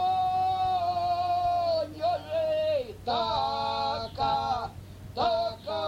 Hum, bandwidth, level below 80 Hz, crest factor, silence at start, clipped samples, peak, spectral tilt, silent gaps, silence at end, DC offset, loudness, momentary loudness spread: none; 15 kHz; -54 dBFS; 12 dB; 0 s; under 0.1%; -16 dBFS; -5.5 dB/octave; none; 0 s; under 0.1%; -28 LUFS; 5 LU